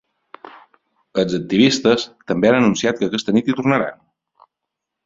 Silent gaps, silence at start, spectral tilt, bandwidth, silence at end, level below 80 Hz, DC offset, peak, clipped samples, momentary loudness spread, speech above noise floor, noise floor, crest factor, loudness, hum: none; 0.45 s; -5 dB/octave; 7.8 kHz; 1.15 s; -56 dBFS; under 0.1%; -2 dBFS; under 0.1%; 8 LU; 64 dB; -81 dBFS; 18 dB; -18 LUFS; none